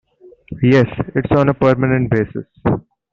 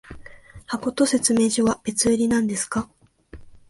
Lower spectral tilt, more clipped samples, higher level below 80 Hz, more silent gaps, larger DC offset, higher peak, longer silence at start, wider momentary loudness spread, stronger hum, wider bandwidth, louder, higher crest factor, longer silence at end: first, -9 dB/octave vs -3.5 dB/octave; neither; first, -40 dBFS vs -50 dBFS; neither; neither; first, 0 dBFS vs -6 dBFS; first, 0.5 s vs 0.1 s; about the same, 10 LU vs 10 LU; neither; second, 6.8 kHz vs 11.5 kHz; first, -16 LUFS vs -21 LUFS; about the same, 16 dB vs 18 dB; first, 0.35 s vs 0.1 s